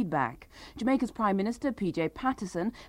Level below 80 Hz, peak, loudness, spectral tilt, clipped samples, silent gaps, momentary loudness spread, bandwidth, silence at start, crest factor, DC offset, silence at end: -56 dBFS; -14 dBFS; -31 LUFS; -6.5 dB/octave; under 0.1%; none; 6 LU; 15 kHz; 0 s; 16 dB; under 0.1%; 0 s